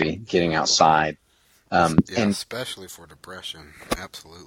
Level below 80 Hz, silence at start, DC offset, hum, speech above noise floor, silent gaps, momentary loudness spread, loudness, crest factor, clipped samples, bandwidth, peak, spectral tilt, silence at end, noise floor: -48 dBFS; 0 s; under 0.1%; none; 35 dB; none; 22 LU; -22 LUFS; 20 dB; under 0.1%; 16.5 kHz; -2 dBFS; -4 dB/octave; 0 s; -57 dBFS